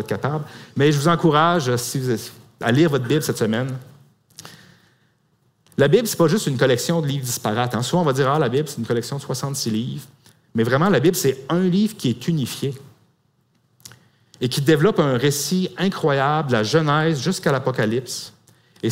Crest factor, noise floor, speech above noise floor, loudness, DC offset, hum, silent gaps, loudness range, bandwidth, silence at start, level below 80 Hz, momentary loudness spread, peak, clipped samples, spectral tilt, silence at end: 18 dB; -64 dBFS; 44 dB; -20 LUFS; under 0.1%; none; none; 4 LU; 16 kHz; 0 s; -58 dBFS; 12 LU; -4 dBFS; under 0.1%; -5.5 dB/octave; 0 s